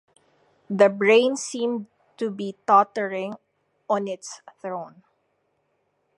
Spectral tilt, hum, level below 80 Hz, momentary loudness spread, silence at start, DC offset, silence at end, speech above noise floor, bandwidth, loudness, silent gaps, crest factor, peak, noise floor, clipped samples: -4 dB/octave; none; -82 dBFS; 17 LU; 0.7 s; under 0.1%; 1.3 s; 49 dB; 11.5 kHz; -23 LUFS; none; 22 dB; -2 dBFS; -71 dBFS; under 0.1%